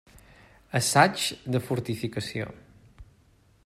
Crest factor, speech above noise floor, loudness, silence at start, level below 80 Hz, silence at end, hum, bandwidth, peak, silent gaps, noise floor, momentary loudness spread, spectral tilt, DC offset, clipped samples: 26 dB; 35 dB; -26 LUFS; 0.75 s; -58 dBFS; 0.65 s; none; 16 kHz; -4 dBFS; none; -61 dBFS; 13 LU; -4 dB/octave; under 0.1%; under 0.1%